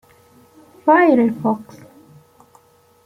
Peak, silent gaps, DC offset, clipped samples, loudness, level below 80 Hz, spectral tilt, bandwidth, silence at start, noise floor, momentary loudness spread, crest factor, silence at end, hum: -2 dBFS; none; under 0.1%; under 0.1%; -16 LUFS; -64 dBFS; -8 dB/octave; 14.5 kHz; 0.85 s; -53 dBFS; 10 LU; 18 dB; 1.45 s; none